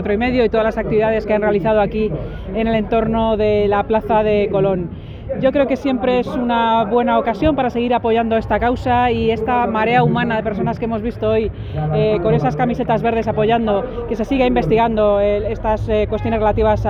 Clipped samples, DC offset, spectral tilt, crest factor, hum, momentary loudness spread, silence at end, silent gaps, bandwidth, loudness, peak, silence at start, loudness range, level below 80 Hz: under 0.1%; under 0.1%; -8.5 dB/octave; 14 dB; none; 6 LU; 0 s; none; 7.2 kHz; -17 LUFS; -2 dBFS; 0 s; 1 LU; -32 dBFS